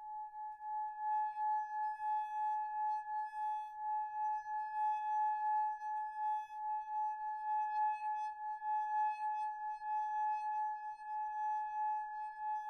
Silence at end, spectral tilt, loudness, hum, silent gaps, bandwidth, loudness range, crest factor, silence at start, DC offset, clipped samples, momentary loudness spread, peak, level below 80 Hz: 0 s; 0 dB/octave; -39 LUFS; none; none; 6.4 kHz; 1 LU; 10 dB; 0 s; under 0.1%; under 0.1%; 6 LU; -30 dBFS; -80 dBFS